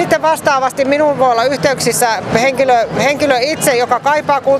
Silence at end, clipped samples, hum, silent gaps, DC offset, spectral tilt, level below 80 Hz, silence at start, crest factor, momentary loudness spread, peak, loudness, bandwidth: 0 s; under 0.1%; none; none; under 0.1%; -3.5 dB/octave; -48 dBFS; 0 s; 12 dB; 2 LU; 0 dBFS; -13 LUFS; 15.5 kHz